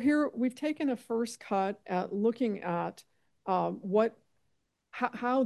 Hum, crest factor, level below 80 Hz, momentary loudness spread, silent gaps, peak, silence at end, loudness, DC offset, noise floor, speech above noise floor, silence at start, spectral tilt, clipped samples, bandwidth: none; 18 dB; -76 dBFS; 6 LU; none; -12 dBFS; 0 s; -32 LUFS; under 0.1%; -78 dBFS; 47 dB; 0 s; -6.5 dB/octave; under 0.1%; 12.5 kHz